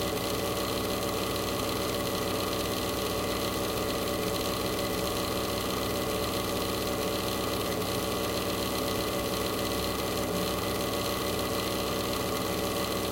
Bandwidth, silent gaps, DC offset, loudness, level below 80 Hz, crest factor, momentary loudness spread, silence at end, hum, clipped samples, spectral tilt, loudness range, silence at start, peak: 17 kHz; none; under 0.1%; -30 LUFS; -46 dBFS; 14 dB; 0 LU; 0 s; none; under 0.1%; -4 dB/octave; 0 LU; 0 s; -16 dBFS